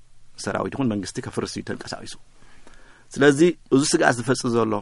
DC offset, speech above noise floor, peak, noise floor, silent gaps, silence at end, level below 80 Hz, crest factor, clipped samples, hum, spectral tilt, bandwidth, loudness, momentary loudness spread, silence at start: under 0.1%; 23 dB; -2 dBFS; -45 dBFS; none; 0 s; -52 dBFS; 22 dB; under 0.1%; none; -4.5 dB/octave; 11.5 kHz; -22 LUFS; 16 LU; 0.15 s